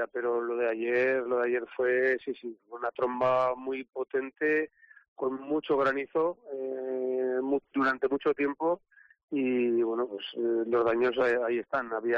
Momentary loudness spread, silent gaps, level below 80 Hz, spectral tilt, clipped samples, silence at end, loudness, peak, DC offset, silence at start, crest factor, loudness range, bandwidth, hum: 9 LU; 5.08-5.16 s, 9.23-9.28 s; -70 dBFS; -3 dB/octave; under 0.1%; 0 s; -29 LUFS; -18 dBFS; under 0.1%; 0 s; 12 dB; 2 LU; 6.2 kHz; none